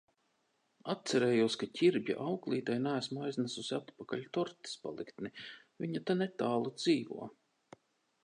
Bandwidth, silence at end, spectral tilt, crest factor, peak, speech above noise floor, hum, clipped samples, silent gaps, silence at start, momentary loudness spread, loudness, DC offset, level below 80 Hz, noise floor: 11 kHz; 0.95 s; -5.5 dB/octave; 18 dB; -18 dBFS; 43 dB; none; under 0.1%; none; 0.85 s; 14 LU; -35 LUFS; under 0.1%; -80 dBFS; -78 dBFS